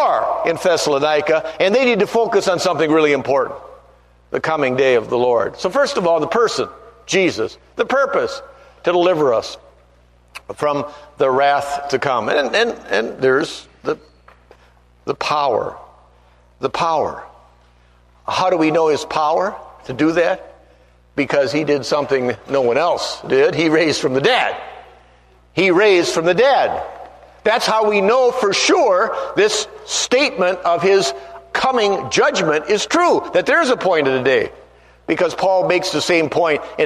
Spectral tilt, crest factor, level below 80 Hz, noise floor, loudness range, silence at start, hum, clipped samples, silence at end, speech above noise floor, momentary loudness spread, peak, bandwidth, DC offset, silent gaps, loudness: -3.5 dB/octave; 16 dB; -54 dBFS; -51 dBFS; 5 LU; 0 s; 60 Hz at -50 dBFS; under 0.1%; 0 s; 35 dB; 11 LU; -2 dBFS; 13.5 kHz; under 0.1%; none; -17 LUFS